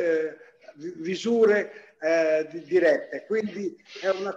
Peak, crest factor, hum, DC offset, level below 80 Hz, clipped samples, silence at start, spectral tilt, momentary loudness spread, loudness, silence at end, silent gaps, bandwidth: -10 dBFS; 16 dB; none; under 0.1%; -76 dBFS; under 0.1%; 0 s; -5 dB/octave; 14 LU; -25 LUFS; 0 s; none; 7.8 kHz